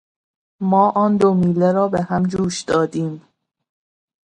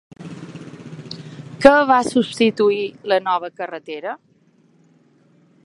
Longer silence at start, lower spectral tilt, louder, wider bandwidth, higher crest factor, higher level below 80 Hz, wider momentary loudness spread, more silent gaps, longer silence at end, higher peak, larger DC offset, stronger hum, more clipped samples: first, 0.6 s vs 0.2 s; first, -7 dB/octave vs -5 dB/octave; about the same, -18 LUFS vs -18 LUFS; about the same, 10.5 kHz vs 11.5 kHz; about the same, 16 dB vs 20 dB; about the same, -52 dBFS vs -54 dBFS; second, 10 LU vs 24 LU; neither; second, 1.05 s vs 1.5 s; about the same, -2 dBFS vs 0 dBFS; neither; neither; neither